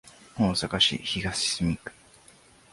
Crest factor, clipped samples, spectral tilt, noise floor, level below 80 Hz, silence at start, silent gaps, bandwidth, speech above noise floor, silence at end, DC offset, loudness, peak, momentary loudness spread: 20 dB; under 0.1%; -3.5 dB/octave; -56 dBFS; -48 dBFS; 0.05 s; none; 11.5 kHz; 29 dB; 0.8 s; under 0.1%; -26 LUFS; -8 dBFS; 15 LU